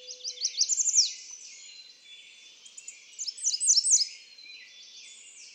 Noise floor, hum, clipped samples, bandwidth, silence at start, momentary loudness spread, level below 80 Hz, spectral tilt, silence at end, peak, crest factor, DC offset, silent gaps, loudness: -52 dBFS; none; under 0.1%; 16.5 kHz; 0 s; 25 LU; under -90 dBFS; 7 dB/octave; 0.05 s; -12 dBFS; 20 dB; under 0.1%; none; -24 LUFS